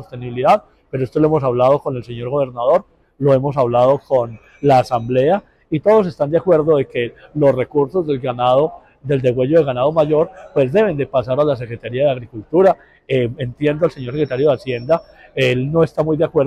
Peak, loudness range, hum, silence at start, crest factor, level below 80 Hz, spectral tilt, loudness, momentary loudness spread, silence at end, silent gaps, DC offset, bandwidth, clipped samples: -4 dBFS; 2 LU; none; 0 s; 12 dB; -48 dBFS; -8 dB/octave; -17 LUFS; 8 LU; 0 s; none; under 0.1%; 10.5 kHz; under 0.1%